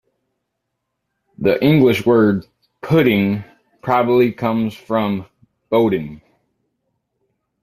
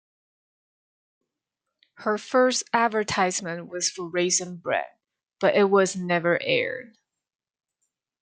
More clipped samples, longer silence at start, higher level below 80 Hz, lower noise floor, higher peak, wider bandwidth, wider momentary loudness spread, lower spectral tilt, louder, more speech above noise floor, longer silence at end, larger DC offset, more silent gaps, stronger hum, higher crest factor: neither; second, 1.4 s vs 2 s; first, -54 dBFS vs -70 dBFS; second, -76 dBFS vs -85 dBFS; first, 0 dBFS vs -6 dBFS; first, 15 kHz vs 9.6 kHz; first, 12 LU vs 9 LU; first, -8 dB/octave vs -3 dB/octave; first, -17 LUFS vs -24 LUFS; about the same, 61 dB vs 61 dB; about the same, 1.45 s vs 1.35 s; neither; neither; neither; about the same, 18 dB vs 22 dB